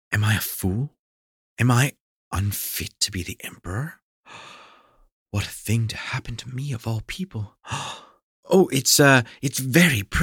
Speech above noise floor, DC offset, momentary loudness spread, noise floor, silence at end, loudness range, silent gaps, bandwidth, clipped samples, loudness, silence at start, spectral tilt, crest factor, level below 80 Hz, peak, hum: 32 dB; under 0.1%; 17 LU; -54 dBFS; 0 s; 10 LU; 0.99-1.57 s, 2.00-2.31 s, 4.02-4.24 s, 5.12-5.26 s, 8.23-8.43 s; 18 kHz; under 0.1%; -23 LUFS; 0.1 s; -4 dB/octave; 20 dB; -44 dBFS; -4 dBFS; none